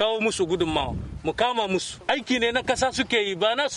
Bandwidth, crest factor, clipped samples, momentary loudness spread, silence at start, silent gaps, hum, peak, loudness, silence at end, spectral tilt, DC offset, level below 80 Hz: 11.5 kHz; 16 dB; under 0.1%; 5 LU; 0 s; none; none; -10 dBFS; -24 LUFS; 0 s; -3.5 dB/octave; under 0.1%; -44 dBFS